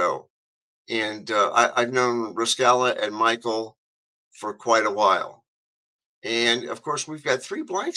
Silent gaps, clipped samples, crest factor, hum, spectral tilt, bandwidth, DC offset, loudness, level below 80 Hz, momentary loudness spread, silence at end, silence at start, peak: 0.30-0.85 s, 3.78-4.31 s, 5.48-5.99 s, 6.05-6.22 s; under 0.1%; 20 dB; none; -2.5 dB/octave; 12.5 kHz; under 0.1%; -23 LUFS; -76 dBFS; 12 LU; 0 s; 0 s; -4 dBFS